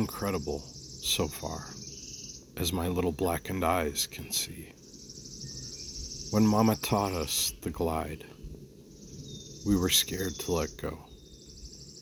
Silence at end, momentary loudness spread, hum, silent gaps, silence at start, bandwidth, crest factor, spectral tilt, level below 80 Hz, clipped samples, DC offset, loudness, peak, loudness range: 0 s; 22 LU; none; none; 0 s; over 20 kHz; 22 dB; -4 dB/octave; -48 dBFS; under 0.1%; under 0.1%; -30 LUFS; -10 dBFS; 3 LU